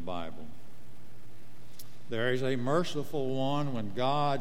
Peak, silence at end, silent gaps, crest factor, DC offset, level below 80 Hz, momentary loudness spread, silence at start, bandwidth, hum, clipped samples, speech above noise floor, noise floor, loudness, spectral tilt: -16 dBFS; 0 s; none; 18 dB; 3%; -66 dBFS; 22 LU; 0 s; 16.5 kHz; none; under 0.1%; 24 dB; -55 dBFS; -32 LUFS; -6 dB/octave